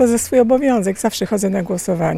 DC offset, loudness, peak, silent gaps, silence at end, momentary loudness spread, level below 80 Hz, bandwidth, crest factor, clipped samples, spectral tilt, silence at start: under 0.1%; -17 LUFS; -2 dBFS; none; 0 s; 6 LU; -48 dBFS; 16 kHz; 14 dB; under 0.1%; -5.5 dB/octave; 0 s